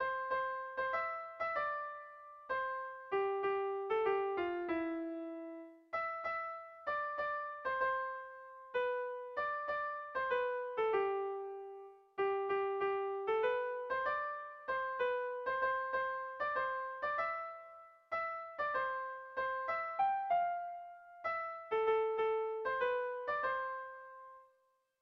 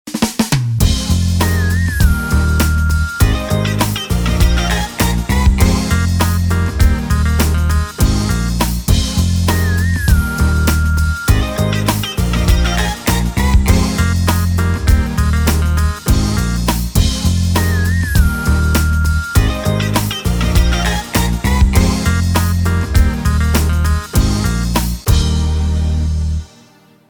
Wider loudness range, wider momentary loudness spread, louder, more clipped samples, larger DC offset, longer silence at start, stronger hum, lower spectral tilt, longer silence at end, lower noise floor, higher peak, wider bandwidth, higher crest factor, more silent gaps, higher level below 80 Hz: about the same, 3 LU vs 1 LU; first, 12 LU vs 3 LU; second, -38 LUFS vs -15 LUFS; neither; neither; about the same, 0 s vs 0.05 s; neither; about the same, -6 dB/octave vs -5 dB/octave; about the same, 0.55 s vs 0.65 s; first, -76 dBFS vs -46 dBFS; second, -24 dBFS vs 0 dBFS; second, 6 kHz vs over 20 kHz; about the same, 16 dB vs 14 dB; neither; second, -74 dBFS vs -16 dBFS